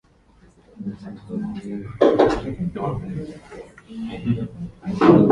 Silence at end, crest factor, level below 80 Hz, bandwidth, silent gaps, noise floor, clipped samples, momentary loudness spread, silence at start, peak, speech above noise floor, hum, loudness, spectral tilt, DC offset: 0 s; 22 dB; -46 dBFS; 10.5 kHz; none; -54 dBFS; under 0.1%; 21 LU; 0.75 s; 0 dBFS; 33 dB; none; -22 LUFS; -8.5 dB/octave; under 0.1%